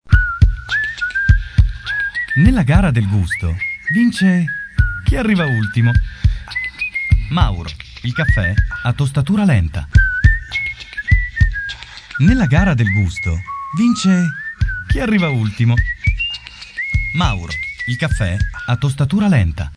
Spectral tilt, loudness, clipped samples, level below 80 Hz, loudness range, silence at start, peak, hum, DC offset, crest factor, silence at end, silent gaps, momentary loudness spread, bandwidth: -6.5 dB/octave; -17 LUFS; 0.1%; -22 dBFS; 3 LU; 0.05 s; 0 dBFS; none; under 0.1%; 16 dB; 0.05 s; none; 8 LU; 11 kHz